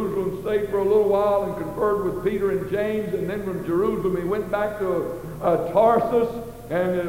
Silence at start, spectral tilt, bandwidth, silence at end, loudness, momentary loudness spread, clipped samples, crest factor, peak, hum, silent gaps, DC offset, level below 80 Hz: 0 s; -7.5 dB/octave; 16 kHz; 0 s; -23 LUFS; 8 LU; under 0.1%; 16 dB; -6 dBFS; none; none; under 0.1%; -46 dBFS